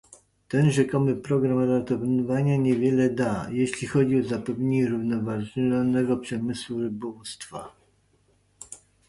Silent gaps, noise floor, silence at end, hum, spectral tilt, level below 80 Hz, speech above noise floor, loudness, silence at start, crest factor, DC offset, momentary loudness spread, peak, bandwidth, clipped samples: none; -65 dBFS; 0.3 s; none; -7 dB/octave; -58 dBFS; 40 dB; -25 LUFS; 0.5 s; 16 dB; under 0.1%; 14 LU; -8 dBFS; 11.5 kHz; under 0.1%